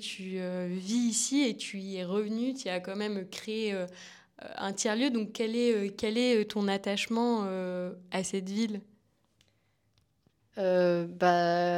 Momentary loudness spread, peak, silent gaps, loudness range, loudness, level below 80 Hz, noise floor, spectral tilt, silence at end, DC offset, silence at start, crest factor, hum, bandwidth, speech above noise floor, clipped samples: 11 LU; -10 dBFS; none; 5 LU; -31 LUFS; -76 dBFS; -72 dBFS; -4 dB/octave; 0 s; under 0.1%; 0 s; 20 dB; none; 15.5 kHz; 42 dB; under 0.1%